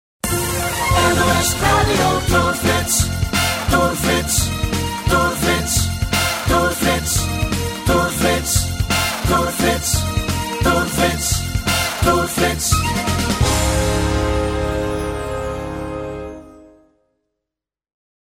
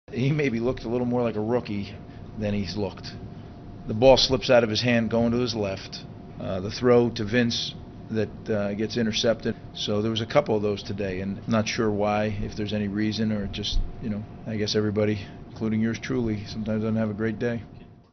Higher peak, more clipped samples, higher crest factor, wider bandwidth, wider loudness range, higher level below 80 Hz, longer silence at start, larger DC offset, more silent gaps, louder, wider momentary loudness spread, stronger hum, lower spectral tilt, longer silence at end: about the same, -2 dBFS vs -4 dBFS; neither; about the same, 16 dB vs 20 dB; first, 16.5 kHz vs 6.4 kHz; about the same, 6 LU vs 5 LU; first, -28 dBFS vs -42 dBFS; first, 0.25 s vs 0.1 s; neither; neither; first, -17 LUFS vs -25 LUFS; second, 6 LU vs 14 LU; neither; about the same, -4 dB/octave vs -4.5 dB/octave; first, 1.75 s vs 0.15 s